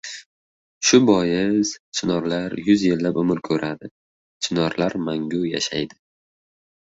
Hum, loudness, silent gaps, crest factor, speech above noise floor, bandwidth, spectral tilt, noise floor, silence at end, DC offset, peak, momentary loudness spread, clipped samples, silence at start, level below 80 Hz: none; -21 LUFS; 0.26-0.81 s, 1.80-1.92 s, 3.91-4.40 s; 20 dB; over 70 dB; 8 kHz; -4.5 dB/octave; under -90 dBFS; 0.95 s; under 0.1%; -2 dBFS; 12 LU; under 0.1%; 0.05 s; -56 dBFS